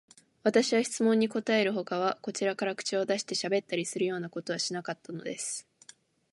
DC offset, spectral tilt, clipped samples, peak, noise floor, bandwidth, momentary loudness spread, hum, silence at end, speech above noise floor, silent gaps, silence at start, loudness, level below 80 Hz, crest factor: under 0.1%; -3.5 dB/octave; under 0.1%; -10 dBFS; -58 dBFS; 11.5 kHz; 10 LU; none; 0.7 s; 28 dB; none; 0.45 s; -30 LUFS; -80 dBFS; 22 dB